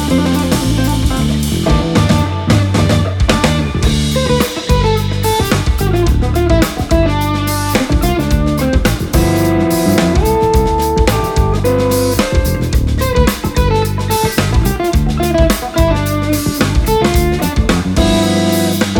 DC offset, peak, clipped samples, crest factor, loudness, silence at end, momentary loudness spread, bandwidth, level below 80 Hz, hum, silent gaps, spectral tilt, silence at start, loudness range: under 0.1%; 0 dBFS; under 0.1%; 12 dB; -13 LUFS; 0 s; 3 LU; 19.5 kHz; -18 dBFS; none; none; -5.5 dB/octave; 0 s; 1 LU